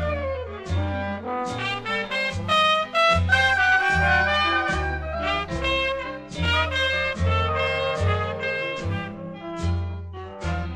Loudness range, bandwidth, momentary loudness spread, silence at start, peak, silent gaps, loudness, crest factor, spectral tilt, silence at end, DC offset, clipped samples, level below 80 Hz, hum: 5 LU; 10.5 kHz; 12 LU; 0 s; -8 dBFS; none; -23 LUFS; 16 dB; -5 dB/octave; 0 s; under 0.1%; under 0.1%; -38 dBFS; none